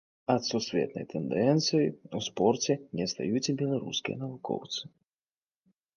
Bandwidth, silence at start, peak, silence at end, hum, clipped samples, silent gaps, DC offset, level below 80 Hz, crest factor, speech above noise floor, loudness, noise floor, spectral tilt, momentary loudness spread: 10.5 kHz; 0.3 s; -10 dBFS; 1.1 s; none; under 0.1%; none; under 0.1%; -68 dBFS; 20 dB; over 60 dB; -30 LUFS; under -90 dBFS; -5 dB/octave; 10 LU